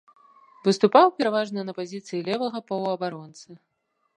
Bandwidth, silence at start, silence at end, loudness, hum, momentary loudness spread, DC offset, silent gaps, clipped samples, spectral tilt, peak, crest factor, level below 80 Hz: 10.5 kHz; 0.65 s; 0.6 s; -24 LUFS; none; 15 LU; under 0.1%; none; under 0.1%; -5.5 dB/octave; -2 dBFS; 22 dB; -80 dBFS